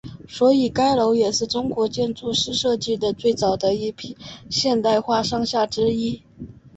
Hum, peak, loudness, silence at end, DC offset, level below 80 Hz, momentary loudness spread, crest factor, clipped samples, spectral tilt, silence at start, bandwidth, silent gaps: none; -6 dBFS; -21 LUFS; 0.25 s; under 0.1%; -52 dBFS; 15 LU; 16 dB; under 0.1%; -4.5 dB/octave; 0.05 s; 8.2 kHz; none